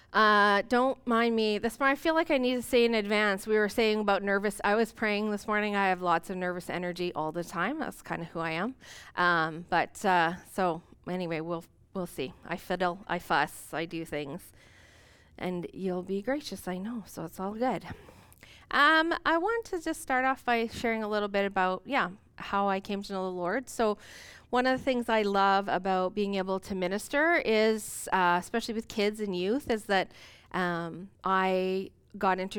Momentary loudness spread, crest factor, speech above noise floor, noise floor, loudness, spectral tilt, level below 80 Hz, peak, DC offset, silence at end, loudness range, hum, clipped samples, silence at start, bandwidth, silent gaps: 12 LU; 18 dB; 29 dB; -58 dBFS; -29 LUFS; -4.5 dB/octave; -58 dBFS; -12 dBFS; under 0.1%; 0 s; 7 LU; none; under 0.1%; 0.1 s; 19 kHz; none